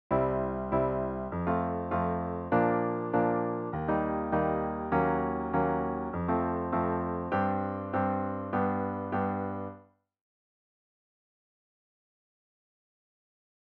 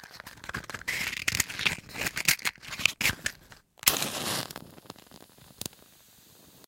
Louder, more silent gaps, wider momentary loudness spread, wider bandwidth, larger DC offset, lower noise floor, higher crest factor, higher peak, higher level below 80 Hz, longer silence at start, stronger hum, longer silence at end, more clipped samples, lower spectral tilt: about the same, -31 LUFS vs -29 LUFS; neither; second, 5 LU vs 19 LU; second, 4.5 kHz vs 17 kHz; neither; about the same, -57 dBFS vs -57 dBFS; second, 18 dB vs 32 dB; second, -14 dBFS vs -2 dBFS; about the same, -52 dBFS vs -56 dBFS; about the same, 0.1 s vs 0 s; neither; first, 3.85 s vs 0.1 s; neither; first, -11 dB/octave vs -1 dB/octave